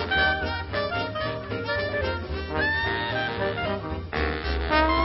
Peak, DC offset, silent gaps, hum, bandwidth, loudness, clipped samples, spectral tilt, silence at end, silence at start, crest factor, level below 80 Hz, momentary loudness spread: -6 dBFS; under 0.1%; none; none; 5.8 kHz; -26 LUFS; under 0.1%; -9.5 dB/octave; 0 s; 0 s; 22 dB; -36 dBFS; 8 LU